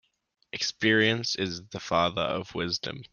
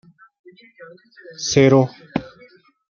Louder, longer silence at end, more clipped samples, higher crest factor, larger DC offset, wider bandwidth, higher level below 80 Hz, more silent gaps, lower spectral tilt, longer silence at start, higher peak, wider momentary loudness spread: second, -27 LUFS vs -18 LUFS; second, 0.05 s vs 0.65 s; neither; about the same, 20 dB vs 20 dB; neither; about the same, 7.2 kHz vs 7.2 kHz; second, -62 dBFS vs -54 dBFS; neither; second, -4 dB/octave vs -5.5 dB/octave; second, 0.55 s vs 0.8 s; second, -8 dBFS vs -2 dBFS; second, 10 LU vs 15 LU